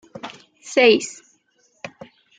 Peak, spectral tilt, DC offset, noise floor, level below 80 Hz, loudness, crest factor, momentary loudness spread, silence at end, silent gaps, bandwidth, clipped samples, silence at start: -2 dBFS; -2.5 dB/octave; under 0.1%; -63 dBFS; -72 dBFS; -17 LUFS; 20 dB; 24 LU; 0.5 s; none; 9.4 kHz; under 0.1%; 0.25 s